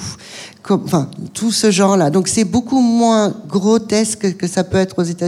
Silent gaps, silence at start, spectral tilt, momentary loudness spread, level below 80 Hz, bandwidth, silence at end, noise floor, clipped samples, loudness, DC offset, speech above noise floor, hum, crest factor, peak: none; 0 s; -5 dB/octave; 9 LU; -48 dBFS; 14 kHz; 0 s; -35 dBFS; under 0.1%; -15 LUFS; under 0.1%; 20 dB; none; 14 dB; -2 dBFS